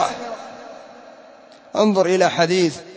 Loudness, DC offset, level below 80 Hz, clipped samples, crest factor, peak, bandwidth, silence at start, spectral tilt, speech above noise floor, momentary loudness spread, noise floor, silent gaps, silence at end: -18 LUFS; under 0.1%; -66 dBFS; under 0.1%; 18 dB; -4 dBFS; 8 kHz; 0 s; -4.5 dB/octave; 28 dB; 22 LU; -45 dBFS; none; 0 s